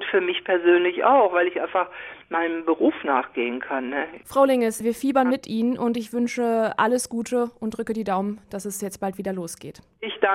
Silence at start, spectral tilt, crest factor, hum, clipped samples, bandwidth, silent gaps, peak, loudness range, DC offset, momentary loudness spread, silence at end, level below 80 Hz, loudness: 0 s; -4.5 dB/octave; 18 dB; none; under 0.1%; 16 kHz; none; -6 dBFS; 5 LU; under 0.1%; 12 LU; 0 s; -62 dBFS; -23 LUFS